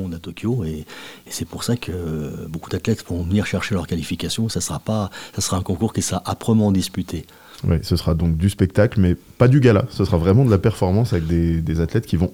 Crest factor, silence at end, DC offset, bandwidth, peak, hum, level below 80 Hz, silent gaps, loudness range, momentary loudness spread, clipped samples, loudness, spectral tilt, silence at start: 18 dB; 0 s; 0.3%; 17 kHz; -2 dBFS; none; -40 dBFS; none; 7 LU; 12 LU; under 0.1%; -20 LUFS; -6 dB/octave; 0 s